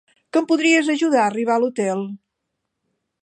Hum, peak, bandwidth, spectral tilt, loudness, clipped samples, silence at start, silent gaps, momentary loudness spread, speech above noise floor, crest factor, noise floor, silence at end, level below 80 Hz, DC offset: none; -4 dBFS; 10 kHz; -4 dB/octave; -19 LUFS; under 0.1%; 0.35 s; none; 8 LU; 60 dB; 18 dB; -78 dBFS; 1.1 s; -80 dBFS; under 0.1%